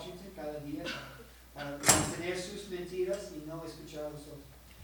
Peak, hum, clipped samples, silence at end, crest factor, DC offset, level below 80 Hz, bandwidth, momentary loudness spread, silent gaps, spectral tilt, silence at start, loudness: -6 dBFS; none; under 0.1%; 0 s; 30 dB; under 0.1%; -56 dBFS; over 20 kHz; 24 LU; none; -2.5 dB/octave; 0 s; -34 LUFS